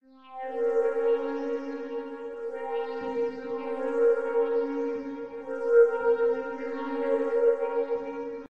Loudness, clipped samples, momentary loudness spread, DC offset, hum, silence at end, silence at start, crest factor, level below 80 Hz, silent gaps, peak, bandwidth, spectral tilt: -28 LUFS; under 0.1%; 12 LU; 0.2%; none; 0 s; 0 s; 18 dB; -70 dBFS; none; -10 dBFS; 5.8 kHz; -6 dB/octave